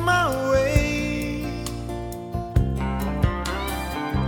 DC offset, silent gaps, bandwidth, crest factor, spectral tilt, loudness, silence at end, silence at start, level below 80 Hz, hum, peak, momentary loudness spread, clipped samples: under 0.1%; none; 19 kHz; 18 dB; -6 dB/octave; -25 LUFS; 0 s; 0 s; -30 dBFS; none; -6 dBFS; 11 LU; under 0.1%